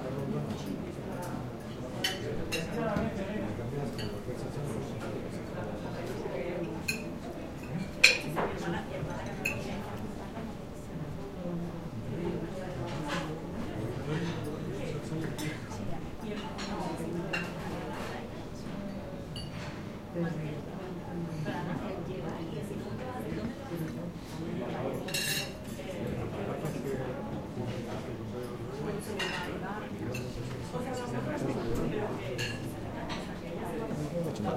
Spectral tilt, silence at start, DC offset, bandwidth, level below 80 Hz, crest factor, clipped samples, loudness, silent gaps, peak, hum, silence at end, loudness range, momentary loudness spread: -5 dB/octave; 0 s; under 0.1%; 16 kHz; -50 dBFS; 34 dB; under 0.1%; -35 LUFS; none; -2 dBFS; none; 0 s; 8 LU; 7 LU